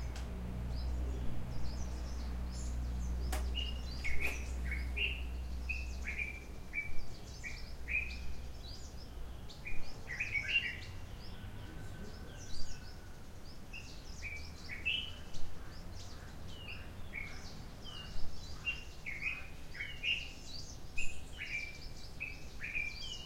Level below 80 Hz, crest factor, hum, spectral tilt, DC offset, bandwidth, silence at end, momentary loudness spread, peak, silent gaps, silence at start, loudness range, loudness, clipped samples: -44 dBFS; 18 dB; none; -3.5 dB/octave; under 0.1%; 16 kHz; 0 s; 14 LU; -20 dBFS; none; 0 s; 7 LU; -42 LUFS; under 0.1%